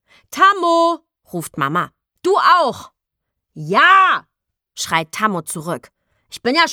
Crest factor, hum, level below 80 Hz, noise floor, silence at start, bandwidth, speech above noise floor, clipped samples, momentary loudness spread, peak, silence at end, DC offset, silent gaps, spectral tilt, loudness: 16 dB; none; -64 dBFS; -79 dBFS; 0.3 s; 18 kHz; 63 dB; under 0.1%; 18 LU; -2 dBFS; 0 s; under 0.1%; none; -3.5 dB/octave; -15 LUFS